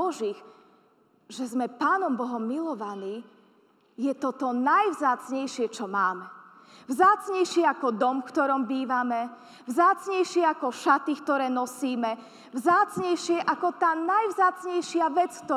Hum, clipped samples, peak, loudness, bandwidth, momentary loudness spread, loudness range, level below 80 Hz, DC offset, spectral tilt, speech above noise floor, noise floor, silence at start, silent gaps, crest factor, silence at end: none; under 0.1%; -8 dBFS; -26 LUFS; 14.5 kHz; 12 LU; 5 LU; -84 dBFS; under 0.1%; -4 dB/octave; 37 dB; -63 dBFS; 0 s; none; 18 dB; 0 s